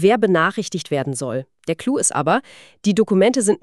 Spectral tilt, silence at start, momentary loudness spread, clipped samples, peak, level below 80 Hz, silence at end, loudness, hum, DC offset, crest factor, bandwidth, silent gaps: -4.5 dB/octave; 0 s; 10 LU; under 0.1%; -2 dBFS; -62 dBFS; 0.05 s; -19 LUFS; none; 0.1%; 16 dB; 13 kHz; none